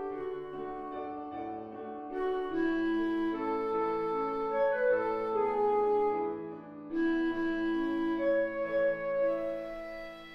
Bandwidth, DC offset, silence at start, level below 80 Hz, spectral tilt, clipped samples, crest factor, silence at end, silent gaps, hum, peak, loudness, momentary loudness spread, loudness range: 5.8 kHz; under 0.1%; 0 s; -58 dBFS; -7 dB/octave; under 0.1%; 12 dB; 0 s; none; none; -20 dBFS; -32 LUFS; 12 LU; 4 LU